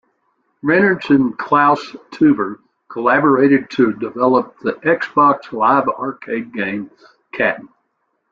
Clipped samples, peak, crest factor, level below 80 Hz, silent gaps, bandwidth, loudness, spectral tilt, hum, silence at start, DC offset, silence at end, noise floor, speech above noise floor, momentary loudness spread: under 0.1%; -2 dBFS; 16 dB; -58 dBFS; none; 7 kHz; -16 LUFS; -7.5 dB/octave; none; 0.65 s; under 0.1%; 0.65 s; -69 dBFS; 53 dB; 12 LU